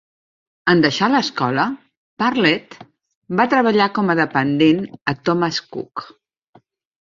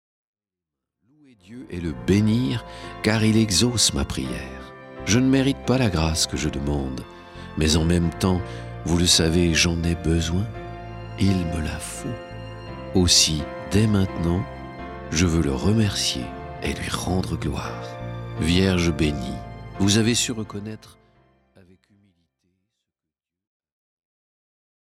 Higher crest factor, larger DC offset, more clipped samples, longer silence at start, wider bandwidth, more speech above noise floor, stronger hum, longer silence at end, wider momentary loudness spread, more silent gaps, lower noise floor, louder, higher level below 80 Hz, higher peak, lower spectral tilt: about the same, 18 dB vs 20 dB; neither; neither; second, 0.65 s vs 1.5 s; second, 7.6 kHz vs 16 kHz; second, 37 dB vs 66 dB; neither; second, 0.95 s vs 4.1 s; second, 10 LU vs 18 LU; first, 1.97-2.17 s, 3.17-3.22 s vs none; second, -55 dBFS vs -88 dBFS; first, -18 LUFS vs -22 LUFS; second, -60 dBFS vs -38 dBFS; about the same, 0 dBFS vs -2 dBFS; about the same, -5.5 dB/octave vs -4.5 dB/octave